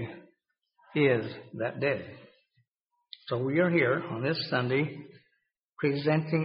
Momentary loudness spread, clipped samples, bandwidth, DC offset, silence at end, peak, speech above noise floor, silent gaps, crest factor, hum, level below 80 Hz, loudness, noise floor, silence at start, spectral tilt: 16 LU; under 0.1%; 5.4 kHz; under 0.1%; 0 s; -12 dBFS; 52 dB; 2.68-2.72 s, 2.81-2.86 s, 5.65-5.69 s; 20 dB; none; -70 dBFS; -29 LUFS; -80 dBFS; 0 s; -5 dB/octave